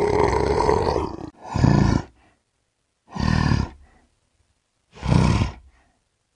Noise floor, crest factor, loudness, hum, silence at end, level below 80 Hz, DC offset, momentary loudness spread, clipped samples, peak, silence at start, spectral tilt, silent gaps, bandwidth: -72 dBFS; 20 dB; -22 LUFS; none; 0.75 s; -34 dBFS; under 0.1%; 13 LU; under 0.1%; -4 dBFS; 0 s; -7 dB/octave; none; 10.5 kHz